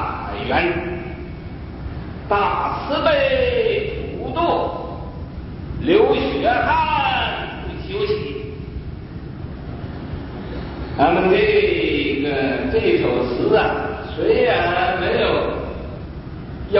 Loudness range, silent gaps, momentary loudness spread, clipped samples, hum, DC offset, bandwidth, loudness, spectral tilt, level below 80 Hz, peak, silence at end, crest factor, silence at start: 6 LU; none; 16 LU; under 0.1%; none; under 0.1%; 5.8 kHz; -19 LUFS; -10.5 dB/octave; -36 dBFS; -2 dBFS; 0 s; 18 dB; 0 s